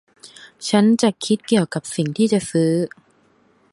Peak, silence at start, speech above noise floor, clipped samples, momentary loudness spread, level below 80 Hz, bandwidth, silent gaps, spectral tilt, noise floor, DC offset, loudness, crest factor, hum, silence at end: -2 dBFS; 0.25 s; 40 dB; under 0.1%; 8 LU; -62 dBFS; 11.5 kHz; none; -5.5 dB/octave; -58 dBFS; under 0.1%; -19 LUFS; 18 dB; none; 0.85 s